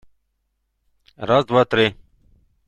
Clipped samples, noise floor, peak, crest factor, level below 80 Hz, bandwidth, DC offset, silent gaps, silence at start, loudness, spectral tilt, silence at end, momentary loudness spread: under 0.1%; -72 dBFS; -2 dBFS; 20 dB; -54 dBFS; 9.4 kHz; under 0.1%; none; 1.2 s; -18 LUFS; -6.5 dB/octave; 0.75 s; 6 LU